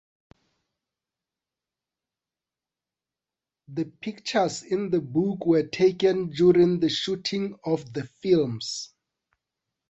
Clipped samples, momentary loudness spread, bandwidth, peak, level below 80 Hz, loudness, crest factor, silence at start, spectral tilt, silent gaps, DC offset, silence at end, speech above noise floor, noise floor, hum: under 0.1%; 13 LU; 8.2 kHz; -8 dBFS; -64 dBFS; -25 LUFS; 18 dB; 3.7 s; -5.5 dB/octave; none; under 0.1%; 1.05 s; over 66 dB; under -90 dBFS; none